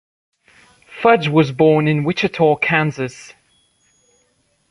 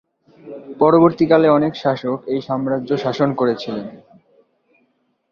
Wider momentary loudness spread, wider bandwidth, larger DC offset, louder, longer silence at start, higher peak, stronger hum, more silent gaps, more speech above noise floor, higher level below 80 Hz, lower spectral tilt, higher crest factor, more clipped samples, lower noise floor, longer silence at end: second, 11 LU vs 19 LU; first, 11 kHz vs 6.8 kHz; neither; about the same, -16 LUFS vs -17 LUFS; first, 0.9 s vs 0.45 s; about the same, -2 dBFS vs 0 dBFS; neither; neither; about the same, 47 dB vs 48 dB; about the same, -56 dBFS vs -58 dBFS; about the same, -7 dB/octave vs -8 dB/octave; about the same, 16 dB vs 18 dB; neither; about the same, -63 dBFS vs -65 dBFS; first, 1.5 s vs 1.35 s